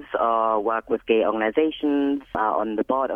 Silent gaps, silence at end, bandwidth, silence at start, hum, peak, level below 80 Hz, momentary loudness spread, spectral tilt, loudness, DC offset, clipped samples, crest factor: none; 0 s; 3.7 kHz; 0 s; none; -8 dBFS; -56 dBFS; 4 LU; -7.5 dB/octave; -23 LUFS; under 0.1%; under 0.1%; 14 dB